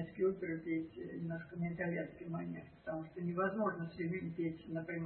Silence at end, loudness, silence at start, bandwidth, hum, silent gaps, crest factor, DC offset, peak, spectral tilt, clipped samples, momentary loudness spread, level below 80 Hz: 0 s; -41 LUFS; 0 s; 4.2 kHz; none; none; 16 dB; under 0.1%; -24 dBFS; -8 dB/octave; under 0.1%; 8 LU; -70 dBFS